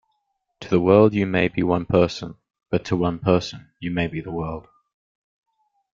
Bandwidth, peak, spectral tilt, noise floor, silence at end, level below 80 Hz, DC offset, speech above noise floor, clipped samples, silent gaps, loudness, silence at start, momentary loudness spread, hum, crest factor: 7.4 kHz; -2 dBFS; -7.5 dB/octave; -74 dBFS; 1.35 s; -50 dBFS; under 0.1%; 54 dB; under 0.1%; none; -21 LUFS; 0.6 s; 18 LU; none; 22 dB